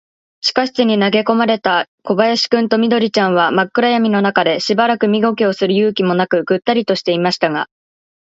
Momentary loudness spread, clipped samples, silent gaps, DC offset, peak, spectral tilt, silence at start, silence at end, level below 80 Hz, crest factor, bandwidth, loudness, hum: 3 LU; under 0.1%; 1.88-1.98 s; under 0.1%; 0 dBFS; -5.5 dB/octave; 0.45 s; 0.65 s; -62 dBFS; 14 dB; 7.8 kHz; -15 LUFS; none